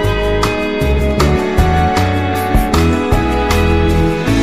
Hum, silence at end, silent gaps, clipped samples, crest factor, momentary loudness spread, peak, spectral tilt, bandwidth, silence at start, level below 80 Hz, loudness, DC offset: none; 0 s; none; under 0.1%; 12 dB; 2 LU; -2 dBFS; -6 dB/octave; 15.5 kHz; 0 s; -18 dBFS; -14 LUFS; 2%